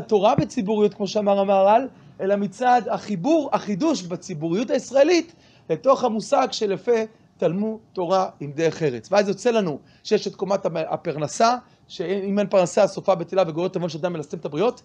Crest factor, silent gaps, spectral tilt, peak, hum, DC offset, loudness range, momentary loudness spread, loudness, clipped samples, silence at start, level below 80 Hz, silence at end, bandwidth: 18 dB; none; -5.5 dB/octave; -4 dBFS; none; under 0.1%; 3 LU; 10 LU; -22 LUFS; under 0.1%; 0 s; -64 dBFS; 0.1 s; 9.8 kHz